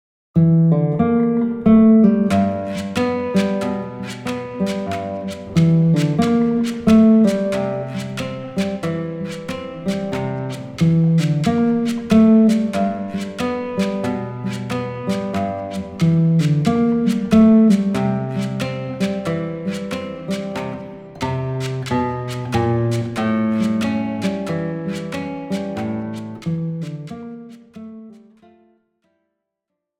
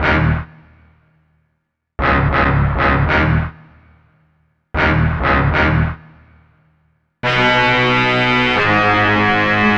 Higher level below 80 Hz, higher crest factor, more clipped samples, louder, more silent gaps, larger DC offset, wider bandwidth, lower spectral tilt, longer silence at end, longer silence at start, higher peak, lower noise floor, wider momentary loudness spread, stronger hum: second, -52 dBFS vs -28 dBFS; about the same, 16 dB vs 16 dB; neither; second, -19 LUFS vs -14 LUFS; neither; neither; first, 12.5 kHz vs 8 kHz; about the same, -7.5 dB/octave vs -6.5 dB/octave; first, 1.85 s vs 0 s; first, 0.35 s vs 0 s; about the same, -4 dBFS vs -2 dBFS; first, -80 dBFS vs -71 dBFS; first, 14 LU vs 9 LU; neither